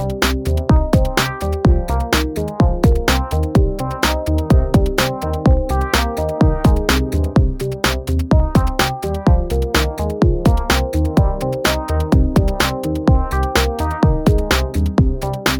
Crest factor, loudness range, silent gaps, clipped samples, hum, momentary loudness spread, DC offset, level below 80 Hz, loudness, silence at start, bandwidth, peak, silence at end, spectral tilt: 14 dB; 1 LU; none; under 0.1%; none; 4 LU; under 0.1%; -20 dBFS; -17 LUFS; 0 s; 19.5 kHz; -2 dBFS; 0 s; -5.5 dB/octave